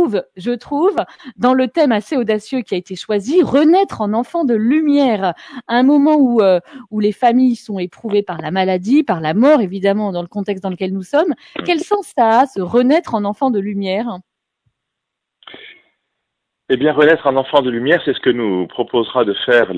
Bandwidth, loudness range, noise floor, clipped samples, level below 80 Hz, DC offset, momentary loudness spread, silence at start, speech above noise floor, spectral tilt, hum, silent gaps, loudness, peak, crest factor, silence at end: 11 kHz; 5 LU; -78 dBFS; under 0.1%; -60 dBFS; under 0.1%; 10 LU; 0 s; 64 dB; -6.5 dB/octave; none; none; -16 LUFS; 0 dBFS; 16 dB; 0 s